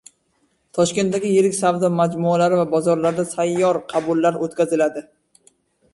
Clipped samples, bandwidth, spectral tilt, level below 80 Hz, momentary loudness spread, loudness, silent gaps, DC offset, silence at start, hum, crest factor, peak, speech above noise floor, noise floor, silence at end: under 0.1%; 11.5 kHz; -5.5 dB/octave; -62 dBFS; 5 LU; -19 LUFS; none; under 0.1%; 0.75 s; none; 14 dB; -6 dBFS; 47 dB; -65 dBFS; 0.95 s